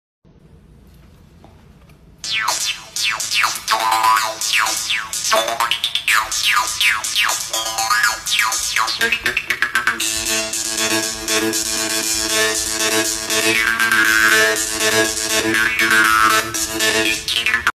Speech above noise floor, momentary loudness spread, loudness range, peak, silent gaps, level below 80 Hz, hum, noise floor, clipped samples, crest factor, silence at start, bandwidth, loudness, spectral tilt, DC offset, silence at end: 29 dB; 6 LU; 4 LU; 0 dBFS; none; -48 dBFS; none; -46 dBFS; under 0.1%; 18 dB; 2.25 s; 15 kHz; -16 LUFS; 0 dB/octave; under 0.1%; 0.05 s